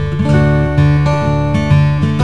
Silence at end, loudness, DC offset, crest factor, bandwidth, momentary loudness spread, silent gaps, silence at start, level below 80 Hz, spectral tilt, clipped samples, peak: 0 s; -12 LUFS; 4%; 12 dB; 8.2 kHz; 3 LU; none; 0 s; -26 dBFS; -8 dB/octave; under 0.1%; 0 dBFS